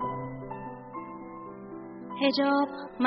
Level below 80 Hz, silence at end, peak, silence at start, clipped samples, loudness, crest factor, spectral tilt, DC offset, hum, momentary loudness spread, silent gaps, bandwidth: -60 dBFS; 0 s; -10 dBFS; 0 s; under 0.1%; -30 LUFS; 22 dB; -3.5 dB/octave; under 0.1%; none; 17 LU; none; 5 kHz